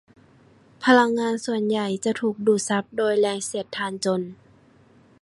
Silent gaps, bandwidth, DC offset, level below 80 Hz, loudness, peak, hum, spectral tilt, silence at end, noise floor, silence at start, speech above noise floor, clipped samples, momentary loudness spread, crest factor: none; 11.5 kHz; under 0.1%; -70 dBFS; -23 LUFS; -4 dBFS; none; -4 dB/octave; 0.85 s; -55 dBFS; 0.8 s; 33 dB; under 0.1%; 11 LU; 20 dB